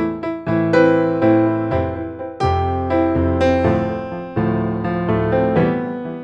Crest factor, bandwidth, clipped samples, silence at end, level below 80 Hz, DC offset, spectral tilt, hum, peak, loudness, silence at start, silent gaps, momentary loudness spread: 16 dB; 7.4 kHz; under 0.1%; 0 s; -38 dBFS; under 0.1%; -8.5 dB/octave; none; 0 dBFS; -18 LUFS; 0 s; none; 10 LU